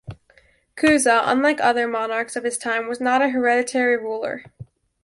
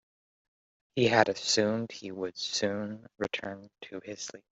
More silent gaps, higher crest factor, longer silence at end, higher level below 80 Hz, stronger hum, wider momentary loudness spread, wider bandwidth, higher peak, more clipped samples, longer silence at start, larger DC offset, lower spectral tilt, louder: neither; second, 16 dB vs 26 dB; first, 0.4 s vs 0.15 s; first, -58 dBFS vs -70 dBFS; neither; second, 9 LU vs 17 LU; first, 11.5 kHz vs 8.2 kHz; about the same, -4 dBFS vs -6 dBFS; neither; second, 0.05 s vs 0.95 s; neither; about the same, -3 dB/octave vs -3.5 dB/octave; first, -20 LUFS vs -30 LUFS